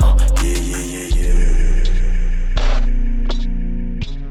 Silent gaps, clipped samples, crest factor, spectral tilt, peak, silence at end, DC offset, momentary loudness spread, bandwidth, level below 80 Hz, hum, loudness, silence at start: none; under 0.1%; 12 dB; -5 dB/octave; -2 dBFS; 0 s; under 0.1%; 8 LU; 12 kHz; -14 dBFS; none; -21 LUFS; 0 s